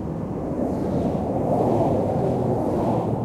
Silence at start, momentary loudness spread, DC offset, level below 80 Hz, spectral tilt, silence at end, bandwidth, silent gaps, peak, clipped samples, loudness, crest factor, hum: 0 s; 6 LU; under 0.1%; -42 dBFS; -9.5 dB/octave; 0 s; 14 kHz; none; -10 dBFS; under 0.1%; -23 LUFS; 14 dB; none